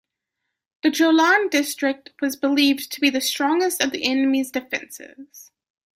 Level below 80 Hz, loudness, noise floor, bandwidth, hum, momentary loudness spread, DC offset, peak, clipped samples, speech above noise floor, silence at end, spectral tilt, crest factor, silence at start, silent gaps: -70 dBFS; -20 LUFS; -81 dBFS; 16 kHz; none; 11 LU; under 0.1%; -4 dBFS; under 0.1%; 60 dB; 0.55 s; -1.5 dB/octave; 18 dB; 0.85 s; none